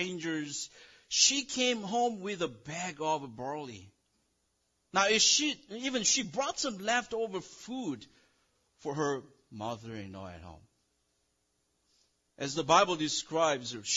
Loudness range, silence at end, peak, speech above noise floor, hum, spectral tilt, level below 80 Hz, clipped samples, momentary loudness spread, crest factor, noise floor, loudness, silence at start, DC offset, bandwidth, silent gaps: 12 LU; 0 s; -10 dBFS; 45 dB; none; -2 dB/octave; -70 dBFS; under 0.1%; 18 LU; 22 dB; -77 dBFS; -30 LUFS; 0 s; under 0.1%; 12 kHz; none